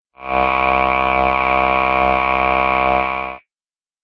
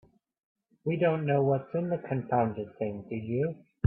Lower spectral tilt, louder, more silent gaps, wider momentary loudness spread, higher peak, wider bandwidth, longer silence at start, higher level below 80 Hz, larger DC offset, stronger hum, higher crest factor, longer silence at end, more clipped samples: second, -6.5 dB/octave vs -12 dB/octave; first, -16 LUFS vs -30 LUFS; neither; second, 6 LU vs 9 LU; first, 0 dBFS vs -12 dBFS; first, 6.2 kHz vs 3.5 kHz; second, 0.2 s vs 0.85 s; first, -36 dBFS vs -70 dBFS; neither; neither; about the same, 16 dB vs 18 dB; first, 0.65 s vs 0 s; neither